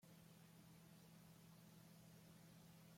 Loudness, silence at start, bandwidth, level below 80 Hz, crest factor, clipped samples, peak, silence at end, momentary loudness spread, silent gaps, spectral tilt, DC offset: -66 LUFS; 0 s; 16.5 kHz; -88 dBFS; 12 dB; under 0.1%; -54 dBFS; 0 s; 1 LU; none; -5 dB/octave; under 0.1%